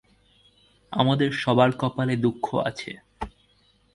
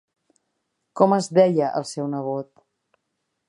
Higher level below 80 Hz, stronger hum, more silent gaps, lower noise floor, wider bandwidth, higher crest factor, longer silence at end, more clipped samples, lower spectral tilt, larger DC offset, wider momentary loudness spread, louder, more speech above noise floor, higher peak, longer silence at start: first, -54 dBFS vs -76 dBFS; neither; neither; second, -62 dBFS vs -77 dBFS; about the same, 11.5 kHz vs 11.5 kHz; about the same, 22 dB vs 22 dB; second, 0.65 s vs 1.05 s; neither; about the same, -7 dB/octave vs -6.5 dB/octave; neither; about the same, 18 LU vs 16 LU; second, -24 LUFS vs -21 LUFS; second, 39 dB vs 57 dB; about the same, -4 dBFS vs -2 dBFS; about the same, 0.9 s vs 0.95 s